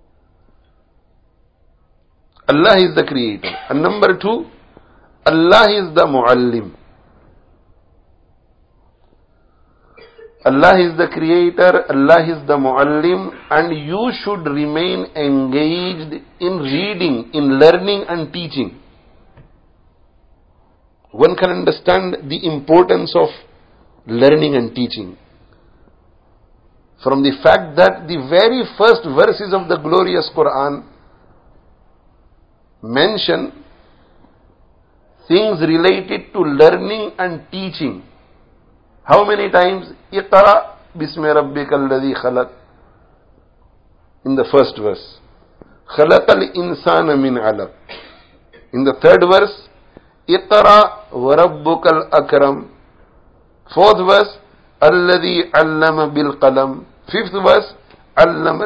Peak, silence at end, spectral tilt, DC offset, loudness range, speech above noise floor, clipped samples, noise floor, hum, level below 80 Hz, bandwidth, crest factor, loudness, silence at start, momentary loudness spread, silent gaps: 0 dBFS; 0 s; -7 dB/octave; under 0.1%; 8 LU; 41 dB; 0.2%; -54 dBFS; none; -48 dBFS; 8 kHz; 16 dB; -14 LUFS; 2.5 s; 13 LU; none